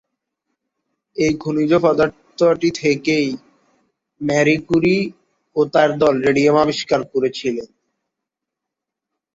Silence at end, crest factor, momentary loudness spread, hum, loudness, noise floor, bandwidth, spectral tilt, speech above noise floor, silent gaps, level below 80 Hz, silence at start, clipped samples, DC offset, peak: 1.7 s; 16 dB; 10 LU; none; -17 LUFS; -83 dBFS; 7.8 kHz; -5.5 dB/octave; 66 dB; none; -54 dBFS; 1.15 s; under 0.1%; under 0.1%; -2 dBFS